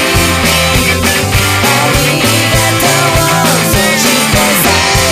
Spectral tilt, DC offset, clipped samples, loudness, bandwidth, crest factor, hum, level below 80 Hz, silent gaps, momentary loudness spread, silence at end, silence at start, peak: -3 dB/octave; under 0.1%; 0.1%; -8 LUFS; 16 kHz; 10 dB; none; -24 dBFS; none; 1 LU; 0 s; 0 s; 0 dBFS